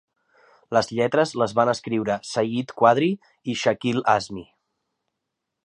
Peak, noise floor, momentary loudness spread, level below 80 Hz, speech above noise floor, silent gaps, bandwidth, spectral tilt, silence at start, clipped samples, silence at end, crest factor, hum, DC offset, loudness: -4 dBFS; -82 dBFS; 8 LU; -62 dBFS; 59 dB; none; 11 kHz; -5.5 dB/octave; 0.7 s; under 0.1%; 1.2 s; 20 dB; none; under 0.1%; -22 LUFS